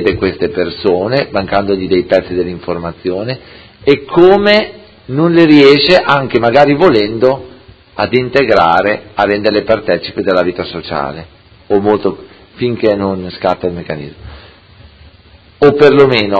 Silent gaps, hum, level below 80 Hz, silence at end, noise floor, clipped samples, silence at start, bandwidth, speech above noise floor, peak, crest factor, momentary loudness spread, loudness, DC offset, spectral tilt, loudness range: none; none; -40 dBFS; 0 s; -42 dBFS; 0.7%; 0 s; 8 kHz; 31 dB; 0 dBFS; 12 dB; 14 LU; -11 LUFS; under 0.1%; -7 dB/octave; 7 LU